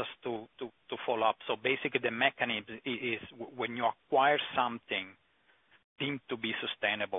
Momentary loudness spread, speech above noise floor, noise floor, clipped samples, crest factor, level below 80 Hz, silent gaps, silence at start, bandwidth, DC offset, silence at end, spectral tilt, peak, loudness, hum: 12 LU; 36 dB; -69 dBFS; under 0.1%; 22 dB; -76 dBFS; 5.84-5.96 s; 0 s; 3.9 kHz; under 0.1%; 0 s; 0.5 dB/octave; -12 dBFS; -33 LUFS; none